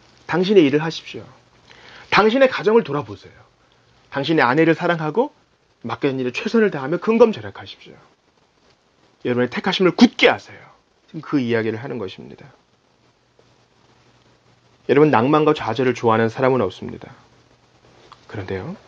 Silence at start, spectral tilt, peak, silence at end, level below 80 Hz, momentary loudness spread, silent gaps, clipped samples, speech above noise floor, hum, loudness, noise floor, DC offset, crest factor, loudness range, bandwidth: 0.3 s; -6.5 dB/octave; 0 dBFS; 0.1 s; -62 dBFS; 21 LU; none; under 0.1%; 41 dB; none; -18 LUFS; -60 dBFS; under 0.1%; 20 dB; 9 LU; 7.4 kHz